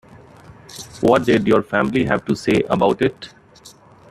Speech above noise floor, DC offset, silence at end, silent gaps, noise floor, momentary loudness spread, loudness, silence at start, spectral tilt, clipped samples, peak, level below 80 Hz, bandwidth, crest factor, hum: 29 dB; under 0.1%; 0.4 s; none; -46 dBFS; 20 LU; -18 LUFS; 0.5 s; -6 dB/octave; under 0.1%; -2 dBFS; -50 dBFS; 14 kHz; 18 dB; none